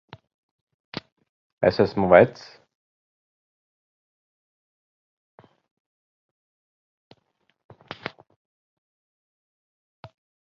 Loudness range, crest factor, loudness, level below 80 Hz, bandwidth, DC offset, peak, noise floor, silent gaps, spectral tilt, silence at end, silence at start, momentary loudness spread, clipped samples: 22 LU; 28 dB; -19 LUFS; -58 dBFS; 6.8 kHz; under 0.1%; -2 dBFS; -71 dBFS; none; -5 dB/octave; 8.1 s; 1.6 s; 23 LU; under 0.1%